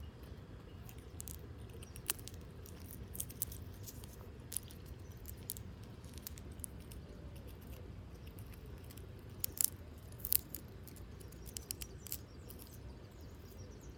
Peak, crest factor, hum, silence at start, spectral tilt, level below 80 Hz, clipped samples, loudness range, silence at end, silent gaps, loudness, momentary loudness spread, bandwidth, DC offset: -8 dBFS; 40 dB; none; 0 s; -3 dB/octave; -56 dBFS; under 0.1%; 10 LU; 0 s; none; -45 LUFS; 18 LU; 19 kHz; under 0.1%